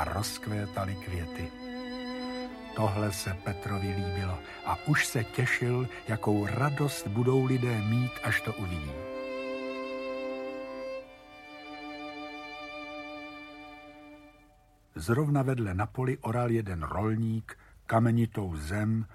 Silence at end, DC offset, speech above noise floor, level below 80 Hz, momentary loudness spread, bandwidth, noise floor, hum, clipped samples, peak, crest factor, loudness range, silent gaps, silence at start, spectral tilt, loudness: 0 s; under 0.1%; 32 dB; -52 dBFS; 15 LU; 15.5 kHz; -61 dBFS; none; under 0.1%; -12 dBFS; 20 dB; 12 LU; none; 0 s; -6 dB/octave; -32 LUFS